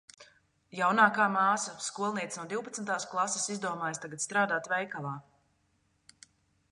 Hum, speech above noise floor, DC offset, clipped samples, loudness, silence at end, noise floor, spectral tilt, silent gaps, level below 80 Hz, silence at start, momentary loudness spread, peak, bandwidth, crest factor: none; 42 dB; under 0.1%; under 0.1%; -30 LUFS; 1.5 s; -73 dBFS; -3 dB/octave; none; -78 dBFS; 0.2 s; 13 LU; -10 dBFS; 11.5 kHz; 22 dB